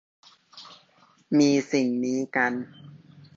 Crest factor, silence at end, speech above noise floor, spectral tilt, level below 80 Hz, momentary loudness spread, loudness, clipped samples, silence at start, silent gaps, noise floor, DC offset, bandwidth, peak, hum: 18 dB; 0.4 s; 36 dB; -5 dB/octave; -74 dBFS; 24 LU; -24 LUFS; under 0.1%; 0.55 s; none; -60 dBFS; under 0.1%; 7.8 kHz; -8 dBFS; none